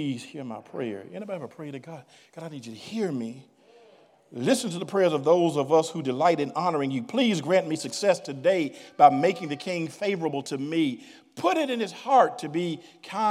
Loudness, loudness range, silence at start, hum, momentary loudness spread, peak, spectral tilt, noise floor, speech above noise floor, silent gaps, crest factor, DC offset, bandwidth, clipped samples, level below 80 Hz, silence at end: -26 LUFS; 12 LU; 0 s; none; 17 LU; -4 dBFS; -5 dB/octave; -57 dBFS; 31 dB; none; 22 dB; under 0.1%; 14.5 kHz; under 0.1%; -84 dBFS; 0 s